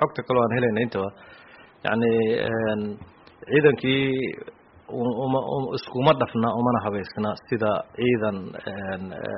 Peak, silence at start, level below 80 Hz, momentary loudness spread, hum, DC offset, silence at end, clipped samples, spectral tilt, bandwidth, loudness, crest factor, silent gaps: -6 dBFS; 0 s; -58 dBFS; 12 LU; none; under 0.1%; 0 s; under 0.1%; -5 dB/octave; 5.6 kHz; -24 LUFS; 20 dB; none